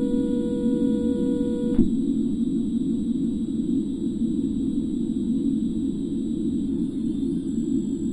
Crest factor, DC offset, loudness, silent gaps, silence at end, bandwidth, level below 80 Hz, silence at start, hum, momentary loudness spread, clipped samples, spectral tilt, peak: 20 dB; under 0.1%; -25 LUFS; none; 0 s; 10.5 kHz; -42 dBFS; 0 s; none; 4 LU; under 0.1%; -8.5 dB/octave; -4 dBFS